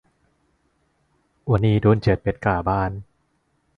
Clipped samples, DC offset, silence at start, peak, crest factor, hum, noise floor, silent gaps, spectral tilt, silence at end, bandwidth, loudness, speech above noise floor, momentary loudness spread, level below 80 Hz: under 0.1%; under 0.1%; 1.45 s; -4 dBFS; 18 dB; none; -68 dBFS; none; -9.5 dB/octave; 0.75 s; 6 kHz; -21 LUFS; 48 dB; 12 LU; -40 dBFS